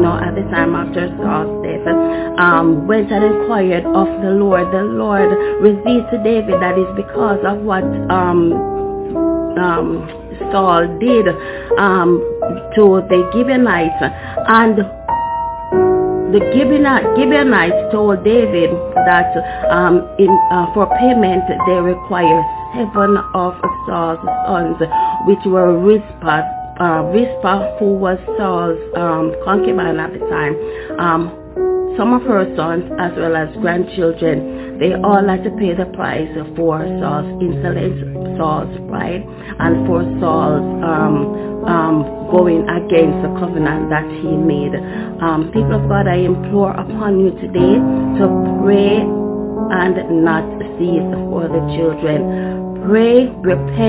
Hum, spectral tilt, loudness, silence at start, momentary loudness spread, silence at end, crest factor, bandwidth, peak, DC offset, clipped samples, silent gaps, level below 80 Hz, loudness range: none; -11 dB/octave; -15 LUFS; 0 s; 8 LU; 0 s; 14 dB; 4 kHz; 0 dBFS; under 0.1%; under 0.1%; none; -38 dBFS; 4 LU